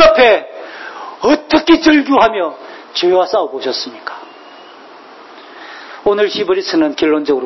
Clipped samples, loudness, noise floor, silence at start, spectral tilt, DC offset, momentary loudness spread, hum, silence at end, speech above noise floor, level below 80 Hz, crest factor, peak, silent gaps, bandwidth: under 0.1%; -13 LUFS; -37 dBFS; 0 s; -4 dB/octave; under 0.1%; 20 LU; none; 0 s; 24 dB; -48 dBFS; 14 dB; 0 dBFS; none; 6.2 kHz